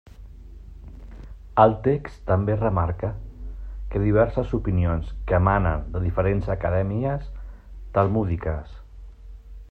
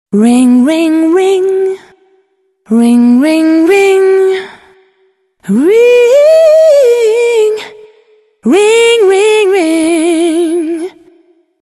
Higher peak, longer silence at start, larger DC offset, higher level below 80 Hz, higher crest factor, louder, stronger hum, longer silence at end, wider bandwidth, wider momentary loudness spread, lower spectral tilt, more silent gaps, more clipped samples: second, -4 dBFS vs 0 dBFS; about the same, 0.1 s vs 0.1 s; neither; first, -34 dBFS vs -58 dBFS; first, 20 dB vs 8 dB; second, -24 LUFS vs -8 LUFS; neither; second, 0.05 s vs 0.8 s; second, 4.5 kHz vs 13 kHz; first, 24 LU vs 12 LU; first, -10.5 dB/octave vs -4.5 dB/octave; neither; neither